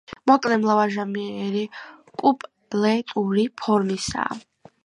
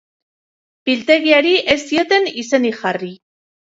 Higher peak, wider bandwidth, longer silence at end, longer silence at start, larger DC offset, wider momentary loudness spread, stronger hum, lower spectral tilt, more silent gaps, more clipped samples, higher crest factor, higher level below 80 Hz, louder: about the same, -2 dBFS vs 0 dBFS; first, 11 kHz vs 8 kHz; about the same, 0.45 s vs 0.45 s; second, 0.1 s vs 0.85 s; neither; about the same, 11 LU vs 12 LU; neither; first, -5.5 dB/octave vs -3.5 dB/octave; neither; neither; about the same, 20 dB vs 18 dB; about the same, -56 dBFS vs -56 dBFS; second, -23 LUFS vs -15 LUFS